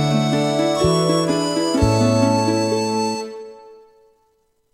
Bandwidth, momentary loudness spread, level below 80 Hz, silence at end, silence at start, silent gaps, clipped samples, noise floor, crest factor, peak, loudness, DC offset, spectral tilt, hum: 16 kHz; 10 LU; -40 dBFS; 1 s; 0 s; none; under 0.1%; -64 dBFS; 16 dB; -4 dBFS; -18 LUFS; under 0.1%; -5.5 dB/octave; none